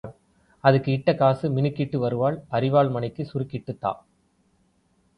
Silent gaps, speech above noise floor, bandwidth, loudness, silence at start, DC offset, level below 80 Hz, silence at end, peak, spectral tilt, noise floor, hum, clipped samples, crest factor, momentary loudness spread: none; 43 dB; 5.4 kHz; -24 LUFS; 0.05 s; under 0.1%; -58 dBFS; 1.2 s; -2 dBFS; -9.5 dB/octave; -65 dBFS; none; under 0.1%; 22 dB; 10 LU